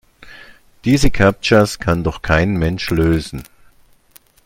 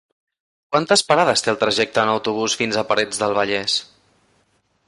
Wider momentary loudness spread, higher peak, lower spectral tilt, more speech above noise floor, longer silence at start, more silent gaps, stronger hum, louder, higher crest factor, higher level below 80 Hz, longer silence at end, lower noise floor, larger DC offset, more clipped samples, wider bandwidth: about the same, 8 LU vs 6 LU; about the same, 0 dBFS vs -2 dBFS; first, -6 dB/octave vs -2.5 dB/octave; second, 35 dB vs 45 dB; second, 0.25 s vs 0.7 s; neither; neither; first, -16 LUFS vs -19 LUFS; about the same, 16 dB vs 18 dB; first, -30 dBFS vs -60 dBFS; about the same, 1.05 s vs 1.05 s; second, -50 dBFS vs -64 dBFS; neither; neither; first, 17 kHz vs 11.5 kHz